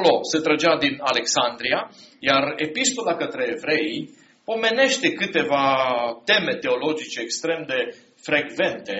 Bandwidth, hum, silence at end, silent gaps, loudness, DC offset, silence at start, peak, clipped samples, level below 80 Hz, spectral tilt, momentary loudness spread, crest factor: 8 kHz; none; 0 s; none; -22 LUFS; under 0.1%; 0 s; -4 dBFS; under 0.1%; -66 dBFS; -1 dB/octave; 9 LU; 18 dB